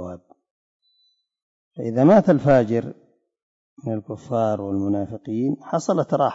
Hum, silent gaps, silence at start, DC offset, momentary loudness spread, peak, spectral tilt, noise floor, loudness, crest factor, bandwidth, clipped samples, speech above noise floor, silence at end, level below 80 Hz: none; 0.51-0.80 s, 1.42-1.71 s, 3.42-3.77 s; 0 s; under 0.1%; 16 LU; -6 dBFS; -8 dB/octave; -66 dBFS; -21 LUFS; 16 dB; 7.8 kHz; under 0.1%; 46 dB; 0 s; -58 dBFS